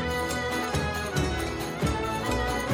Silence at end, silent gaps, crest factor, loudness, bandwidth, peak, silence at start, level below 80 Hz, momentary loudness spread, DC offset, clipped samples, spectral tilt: 0 s; none; 14 dB; -28 LUFS; 17 kHz; -14 dBFS; 0 s; -38 dBFS; 1 LU; under 0.1%; under 0.1%; -4.5 dB/octave